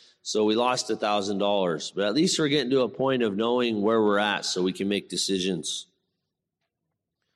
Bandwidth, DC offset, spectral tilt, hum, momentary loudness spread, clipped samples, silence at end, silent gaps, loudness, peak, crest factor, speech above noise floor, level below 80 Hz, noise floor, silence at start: 13 kHz; under 0.1%; -4 dB/octave; none; 5 LU; under 0.1%; 1.5 s; none; -25 LUFS; -10 dBFS; 16 dB; 58 dB; -72 dBFS; -83 dBFS; 0.25 s